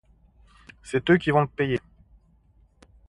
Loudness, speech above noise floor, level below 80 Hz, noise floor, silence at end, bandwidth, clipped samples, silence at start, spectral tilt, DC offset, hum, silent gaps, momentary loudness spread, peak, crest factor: -24 LUFS; 37 dB; -54 dBFS; -60 dBFS; 1.3 s; 11 kHz; under 0.1%; 0.85 s; -7 dB/octave; under 0.1%; none; none; 11 LU; -6 dBFS; 20 dB